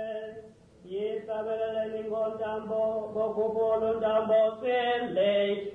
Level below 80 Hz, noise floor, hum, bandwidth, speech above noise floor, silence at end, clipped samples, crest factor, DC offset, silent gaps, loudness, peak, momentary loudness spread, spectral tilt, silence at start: -64 dBFS; -51 dBFS; none; 4.2 kHz; 24 dB; 0 s; under 0.1%; 12 dB; under 0.1%; none; -29 LUFS; -16 dBFS; 10 LU; -6.5 dB/octave; 0 s